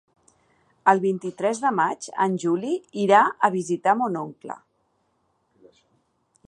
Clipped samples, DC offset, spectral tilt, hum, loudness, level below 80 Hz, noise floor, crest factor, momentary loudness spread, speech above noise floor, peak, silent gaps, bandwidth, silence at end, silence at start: under 0.1%; under 0.1%; -5.5 dB/octave; none; -22 LUFS; -76 dBFS; -70 dBFS; 22 dB; 14 LU; 47 dB; -2 dBFS; none; 11.5 kHz; 1.9 s; 0.85 s